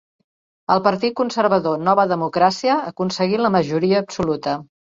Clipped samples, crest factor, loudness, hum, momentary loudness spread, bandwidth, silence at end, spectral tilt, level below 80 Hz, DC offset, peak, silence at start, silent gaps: under 0.1%; 18 dB; -19 LUFS; none; 7 LU; 7.8 kHz; 0.3 s; -6 dB/octave; -56 dBFS; under 0.1%; -2 dBFS; 0.7 s; none